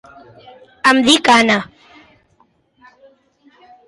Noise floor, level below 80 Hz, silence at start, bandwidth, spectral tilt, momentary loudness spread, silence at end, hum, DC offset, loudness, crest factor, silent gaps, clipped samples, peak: -58 dBFS; -58 dBFS; 0.85 s; 11.5 kHz; -2.5 dB/octave; 9 LU; 2.25 s; none; under 0.1%; -12 LUFS; 18 dB; none; under 0.1%; 0 dBFS